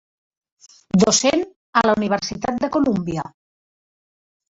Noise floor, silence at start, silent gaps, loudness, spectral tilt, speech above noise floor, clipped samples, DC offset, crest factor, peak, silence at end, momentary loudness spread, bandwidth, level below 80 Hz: under -90 dBFS; 0.95 s; 1.56-1.73 s; -19 LUFS; -4 dB/octave; over 71 dB; under 0.1%; under 0.1%; 20 dB; -2 dBFS; 1.2 s; 10 LU; 8 kHz; -54 dBFS